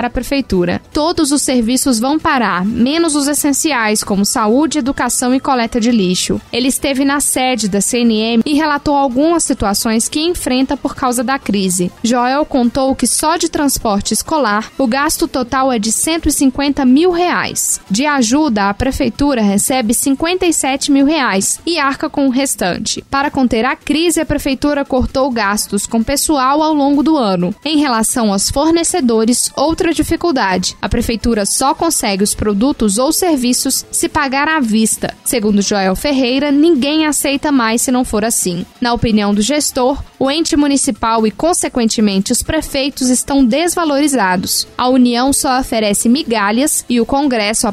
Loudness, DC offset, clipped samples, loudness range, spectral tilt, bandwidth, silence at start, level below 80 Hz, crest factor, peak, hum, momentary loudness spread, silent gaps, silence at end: -13 LUFS; under 0.1%; under 0.1%; 1 LU; -3.5 dB/octave; 16 kHz; 0 s; -34 dBFS; 12 dB; -2 dBFS; none; 4 LU; none; 0 s